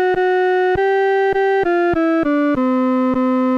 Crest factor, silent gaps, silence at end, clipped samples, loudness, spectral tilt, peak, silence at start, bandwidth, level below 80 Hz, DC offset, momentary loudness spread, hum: 6 dB; none; 0 s; under 0.1%; -16 LUFS; -7 dB/octave; -10 dBFS; 0 s; 6.6 kHz; -46 dBFS; under 0.1%; 1 LU; none